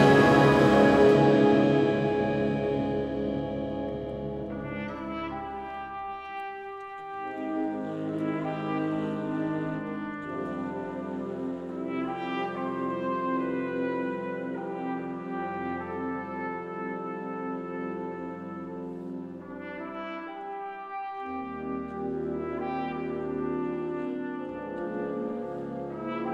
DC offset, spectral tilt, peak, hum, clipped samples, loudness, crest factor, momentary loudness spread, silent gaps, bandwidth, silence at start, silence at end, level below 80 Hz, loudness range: under 0.1%; -7.5 dB/octave; -8 dBFS; none; under 0.1%; -29 LUFS; 20 dB; 16 LU; none; 12 kHz; 0 s; 0 s; -54 dBFS; 11 LU